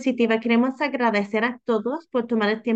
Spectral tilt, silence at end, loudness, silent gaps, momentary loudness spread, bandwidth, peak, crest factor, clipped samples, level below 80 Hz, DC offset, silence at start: -6 dB/octave; 0 s; -23 LUFS; none; 5 LU; 7.8 kHz; -8 dBFS; 14 dB; under 0.1%; -72 dBFS; under 0.1%; 0 s